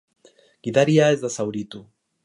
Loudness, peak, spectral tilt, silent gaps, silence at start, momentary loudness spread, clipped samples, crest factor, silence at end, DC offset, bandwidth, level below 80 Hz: -20 LUFS; -4 dBFS; -5.5 dB/octave; none; 0.65 s; 19 LU; under 0.1%; 18 dB; 0.45 s; under 0.1%; 11.5 kHz; -68 dBFS